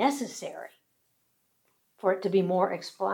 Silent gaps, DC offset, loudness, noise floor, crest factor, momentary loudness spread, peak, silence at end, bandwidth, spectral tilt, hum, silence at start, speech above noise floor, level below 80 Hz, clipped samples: none; under 0.1%; -29 LUFS; -73 dBFS; 18 dB; 16 LU; -12 dBFS; 0 s; 18 kHz; -5.5 dB/octave; none; 0 s; 45 dB; under -90 dBFS; under 0.1%